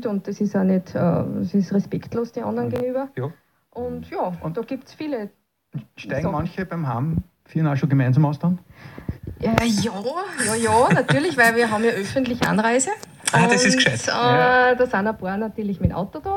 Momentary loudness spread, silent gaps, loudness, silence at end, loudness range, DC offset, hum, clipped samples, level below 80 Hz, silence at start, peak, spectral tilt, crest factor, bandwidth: 15 LU; none; -21 LUFS; 0 s; 10 LU; under 0.1%; none; under 0.1%; -46 dBFS; 0 s; 0 dBFS; -5 dB/octave; 22 dB; 17 kHz